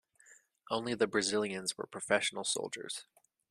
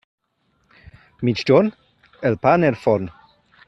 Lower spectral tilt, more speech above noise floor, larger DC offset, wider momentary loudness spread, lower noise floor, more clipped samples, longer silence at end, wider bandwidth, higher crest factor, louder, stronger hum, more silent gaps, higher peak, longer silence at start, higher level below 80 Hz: second, -2.5 dB/octave vs -7.5 dB/octave; second, 29 dB vs 49 dB; neither; about the same, 10 LU vs 9 LU; about the same, -63 dBFS vs -66 dBFS; neither; about the same, 0.5 s vs 0.6 s; first, 13.5 kHz vs 8 kHz; about the same, 24 dB vs 20 dB; second, -34 LUFS vs -19 LUFS; neither; neither; second, -12 dBFS vs -2 dBFS; second, 0.3 s vs 1.2 s; second, -78 dBFS vs -56 dBFS